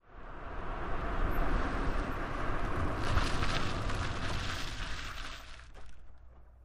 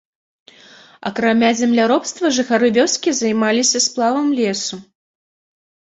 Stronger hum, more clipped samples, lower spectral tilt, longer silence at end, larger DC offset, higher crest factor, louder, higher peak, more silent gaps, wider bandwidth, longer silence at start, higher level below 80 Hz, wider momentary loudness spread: neither; neither; first, -5 dB/octave vs -2.5 dB/octave; second, 0 s vs 1.1 s; neither; about the same, 16 dB vs 16 dB; second, -37 LUFS vs -16 LUFS; second, -18 dBFS vs -2 dBFS; neither; first, 13.5 kHz vs 8.2 kHz; second, 0.05 s vs 1 s; first, -38 dBFS vs -62 dBFS; first, 15 LU vs 9 LU